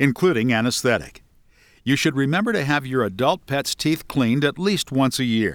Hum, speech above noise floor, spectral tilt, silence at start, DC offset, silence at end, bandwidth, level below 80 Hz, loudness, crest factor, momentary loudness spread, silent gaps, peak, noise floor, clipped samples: none; 34 dB; -5 dB/octave; 0 s; under 0.1%; 0 s; 19 kHz; -52 dBFS; -21 LUFS; 18 dB; 4 LU; none; -2 dBFS; -55 dBFS; under 0.1%